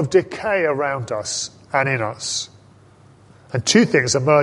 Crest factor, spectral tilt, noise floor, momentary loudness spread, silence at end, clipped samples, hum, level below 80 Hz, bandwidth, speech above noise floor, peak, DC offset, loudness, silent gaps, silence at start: 18 dB; -4 dB/octave; -49 dBFS; 10 LU; 0 s; under 0.1%; none; -54 dBFS; 11.5 kHz; 30 dB; -2 dBFS; under 0.1%; -20 LUFS; none; 0 s